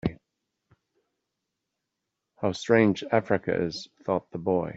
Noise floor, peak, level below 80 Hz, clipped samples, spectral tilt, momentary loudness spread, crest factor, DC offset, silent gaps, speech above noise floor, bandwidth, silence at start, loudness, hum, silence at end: -84 dBFS; -6 dBFS; -58 dBFS; under 0.1%; -6.5 dB/octave; 11 LU; 22 dB; under 0.1%; none; 58 dB; 8 kHz; 0.05 s; -27 LUFS; none; 0 s